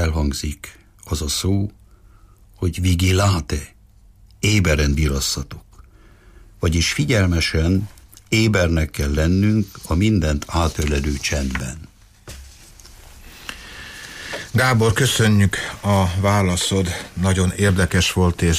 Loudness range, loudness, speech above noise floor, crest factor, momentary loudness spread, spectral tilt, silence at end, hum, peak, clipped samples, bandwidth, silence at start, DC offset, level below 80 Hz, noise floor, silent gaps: 7 LU; -19 LUFS; 30 dB; 14 dB; 18 LU; -5 dB/octave; 0 s; none; -6 dBFS; under 0.1%; 15.5 kHz; 0 s; under 0.1%; -30 dBFS; -49 dBFS; none